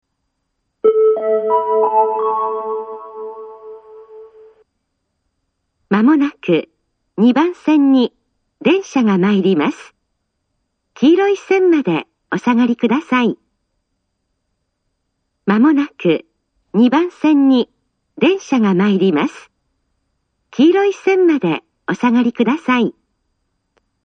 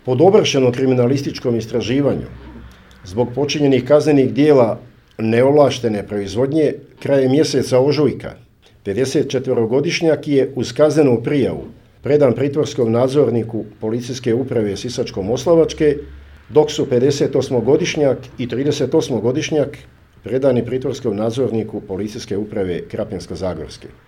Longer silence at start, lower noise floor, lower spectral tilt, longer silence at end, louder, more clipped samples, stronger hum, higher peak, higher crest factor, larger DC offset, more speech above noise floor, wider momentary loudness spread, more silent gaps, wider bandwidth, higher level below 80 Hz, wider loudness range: first, 0.85 s vs 0.05 s; first, -71 dBFS vs -39 dBFS; about the same, -7 dB/octave vs -6 dB/octave; first, 1.15 s vs 0.2 s; about the same, -15 LUFS vs -17 LUFS; neither; neither; about the same, 0 dBFS vs 0 dBFS; about the same, 16 dB vs 16 dB; neither; first, 58 dB vs 23 dB; about the same, 12 LU vs 12 LU; neither; second, 7.8 kHz vs 14 kHz; second, -64 dBFS vs -46 dBFS; about the same, 5 LU vs 4 LU